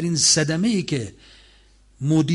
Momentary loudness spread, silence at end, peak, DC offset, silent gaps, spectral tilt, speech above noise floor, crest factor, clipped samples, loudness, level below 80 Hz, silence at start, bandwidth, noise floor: 13 LU; 0 s; -8 dBFS; under 0.1%; none; -3.5 dB/octave; 33 dB; 14 dB; under 0.1%; -20 LUFS; -52 dBFS; 0 s; 11.5 kHz; -53 dBFS